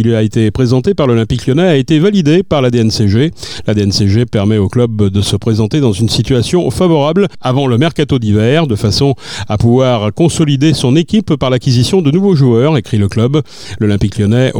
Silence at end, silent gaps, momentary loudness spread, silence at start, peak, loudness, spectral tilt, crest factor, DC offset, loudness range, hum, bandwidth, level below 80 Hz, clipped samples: 0 s; none; 4 LU; 0 s; 0 dBFS; -11 LUFS; -6.5 dB/octave; 10 dB; under 0.1%; 1 LU; none; 15.5 kHz; -36 dBFS; under 0.1%